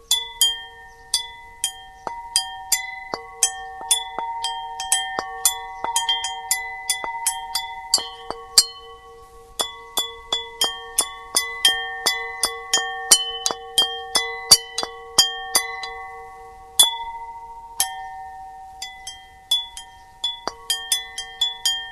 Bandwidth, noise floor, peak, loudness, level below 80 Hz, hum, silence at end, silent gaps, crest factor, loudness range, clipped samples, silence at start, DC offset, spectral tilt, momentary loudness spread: 16 kHz; -44 dBFS; 0 dBFS; -21 LUFS; -54 dBFS; none; 0 s; none; 24 dB; 7 LU; under 0.1%; 0.1 s; under 0.1%; 2 dB/octave; 19 LU